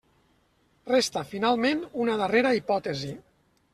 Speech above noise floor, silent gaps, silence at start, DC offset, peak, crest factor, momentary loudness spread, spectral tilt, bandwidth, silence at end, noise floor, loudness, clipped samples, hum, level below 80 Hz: 41 dB; none; 0.85 s; under 0.1%; -8 dBFS; 20 dB; 13 LU; -4 dB/octave; 14 kHz; 0.55 s; -66 dBFS; -26 LUFS; under 0.1%; none; -64 dBFS